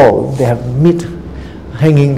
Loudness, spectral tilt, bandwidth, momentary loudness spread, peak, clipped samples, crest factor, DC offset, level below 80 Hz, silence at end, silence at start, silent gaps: -12 LUFS; -8.5 dB/octave; 12 kHz; 18 LU; 0 dBFS; 0.6%; 12 dB; 0.8%; -34 dBFS; 0 s; 0 s; none